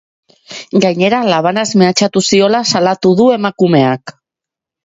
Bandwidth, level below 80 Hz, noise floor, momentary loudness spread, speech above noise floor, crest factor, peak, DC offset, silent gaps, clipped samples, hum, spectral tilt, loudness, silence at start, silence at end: 8 kHz; -54 dBFS; -85 dBFS; 5 LU; 74 dB; 12 dB; 0 dBFS; under 0.1%; none; under 0.1%; none; -5 dB/octave; -11 LUFS; 0.5 s; 0.75 s